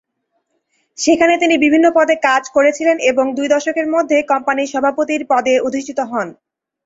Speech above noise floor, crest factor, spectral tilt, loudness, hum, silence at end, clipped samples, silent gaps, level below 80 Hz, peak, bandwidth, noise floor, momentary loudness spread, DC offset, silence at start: 55 dB; 14 dB; -3 dB/octave; -15 LUFS; none; 0.55 s; under 0.1%; none; -58 dBFS; 0 dBFS; 8 kHz; -69 dBFS; 8 LU; under 0.1%; 1 s